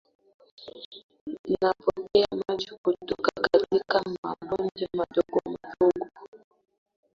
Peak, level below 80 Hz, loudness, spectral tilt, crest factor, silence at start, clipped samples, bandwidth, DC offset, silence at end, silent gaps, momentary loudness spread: -6 dBFS; -62 dBFS; -27 LUFS; -6 dB/octave; 22 dB; 0.6 s; under 0.1%; 7.4 kHz; under 0.1%; 0.85 s; 0.85-0.91 s, 1.03-1.09 s, 1.21-1.27 s, 1.39-1.44 s, 2.78-2.84 s, 4.18-4.23 s, 6.28-6.32 s; 19 LU